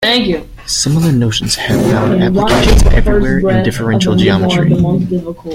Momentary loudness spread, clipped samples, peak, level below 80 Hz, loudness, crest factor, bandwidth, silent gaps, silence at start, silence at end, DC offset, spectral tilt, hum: 5 LU; under 0.1%; 0 dBFS; -18 dBFS; -12 LUFS; 10 dB; 16.5 kHz; none; 0 s; 0 s; under 0.1%; -5 dB/octave; none